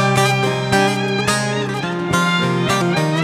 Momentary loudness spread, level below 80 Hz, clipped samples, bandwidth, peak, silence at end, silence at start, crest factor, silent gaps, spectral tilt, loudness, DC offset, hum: 5 LU; -50 dBFS; under 0.1%; 16 kHz; 0 dBFS; 0 s; 0 s; 16 dB; none; -4.5 dB/octave; -17 LUFS; under 0.1%; none